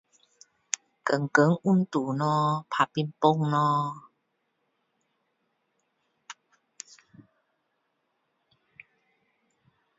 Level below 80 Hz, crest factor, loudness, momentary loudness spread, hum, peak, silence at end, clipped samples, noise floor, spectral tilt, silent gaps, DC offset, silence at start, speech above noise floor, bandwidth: -76 dBFS; 26 dB; -26 LUFS; 23 LU; none; -4 dBFS; 3.65 s; under 0.1%; -77 dBFS; -5.5 dB/octave; none; under 0.1%; 1.05 s; 52 dB; 7.8 kHz